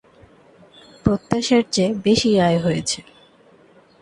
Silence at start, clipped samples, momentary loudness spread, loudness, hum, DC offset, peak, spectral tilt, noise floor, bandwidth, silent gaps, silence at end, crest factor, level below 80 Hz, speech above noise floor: 1.05 s; under 0.1%; 8 LU; -19 LUFS; none; under 0.1%; 0 dBFS; -5 dB/octave; -52 dBFS; 11.5 kHz; none; 1 s; 20 dB; -46 dBFS; 33 dB